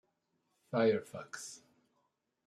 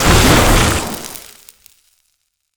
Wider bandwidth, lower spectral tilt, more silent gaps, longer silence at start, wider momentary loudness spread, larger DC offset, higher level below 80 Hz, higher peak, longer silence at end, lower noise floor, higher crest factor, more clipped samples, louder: second, 13 kHz vs over 20 kHz; about the same, -5 dB/octave vs -4 dB/octave; neither; first, 0.7 s vs 0 s; about the same, 17 LU vs 19 LU; neither; second, -84 dBFS vs -22 dBFS; second, -18 dBFS vs 0 dBFS; second, 0.9 s vs 1.35 s; first, -81 dBFS vs -67 dBFS; first, 20 dB vs 14 dB; neither; second, -34 LUFS vs -12 LUFS